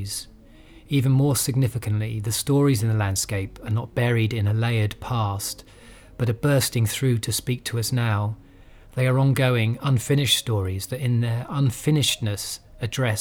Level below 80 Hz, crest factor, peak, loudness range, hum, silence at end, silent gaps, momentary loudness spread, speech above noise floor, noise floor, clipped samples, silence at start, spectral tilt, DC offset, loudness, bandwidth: -48 dBFS; 16 dB; -8 dBFS; 2 LU; none; 0 s; none; 10 LU; 25 dB; -48 dBFS; under 0.1%; 0 s; -5 dB/octave; under 0.1%; -23 LUFS; 19 kHz